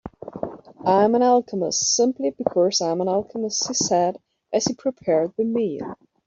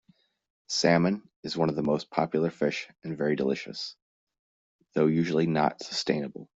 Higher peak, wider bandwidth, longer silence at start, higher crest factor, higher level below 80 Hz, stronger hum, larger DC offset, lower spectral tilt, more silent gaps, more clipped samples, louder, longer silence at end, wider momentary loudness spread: first, -4 dBFS vs -8 dBFS; about the same, 7.8 kHz vs 8 kHz; second, 0.05 s vs 0.7 s; about the same, 18 dB vs 20 dB; about the same, -62 dBFS vs -66 dBFS; neither; neither; second, -3.5 dB/octave vs -5.5 dB/octave; second, none vs 1.36-1.43 s, 4.02-4.27 s, 4.39-4.79 s; neither; first, -21 LUFS vs -28 LUFS; first, 0.3 s vs 0.1 s; first, 15 LU vs 12 LU